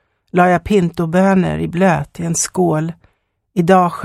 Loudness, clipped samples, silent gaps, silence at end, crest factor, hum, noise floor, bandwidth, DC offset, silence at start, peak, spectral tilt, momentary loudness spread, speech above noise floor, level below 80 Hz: -15 LUFS; under 0.1%; none; 0 s; 16 dB; none; -60 dBFS; 14 kHz; under 0.1%; 0.35 s; 0 dBFS; -6 dB/octave; 8 LU; 46 dB; -42 dBFS